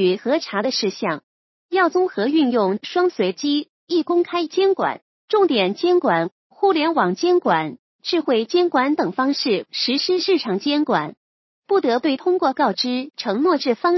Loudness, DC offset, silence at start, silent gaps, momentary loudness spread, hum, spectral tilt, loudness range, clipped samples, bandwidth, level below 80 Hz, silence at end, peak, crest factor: -20 LUFS; under 0.1%; 0 s; 1.23-1.69 s, 3.69-3.87 s, 5.02-5.28 s, 6.32-6.50 s, 7.79-7.99 s, 11.17-11.63 s; 6 LU; none; -5 dB/octave; 1 LU; under 0.1%; 6.2 kHz; -76 dBFS; 0 s; -4 dBFS; 16 dB